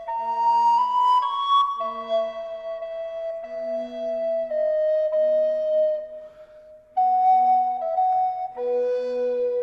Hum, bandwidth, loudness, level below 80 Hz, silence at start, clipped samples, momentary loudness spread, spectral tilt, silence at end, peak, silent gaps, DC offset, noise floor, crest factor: none; 7.4 kHz; -23 LUFS; -66 dBFS; 0 s; under 0.1%; 13 LU; -3.5 dB/octave; 0 s; -10 dBFS; none; under 0.1%; -48 dBFS; 12 dB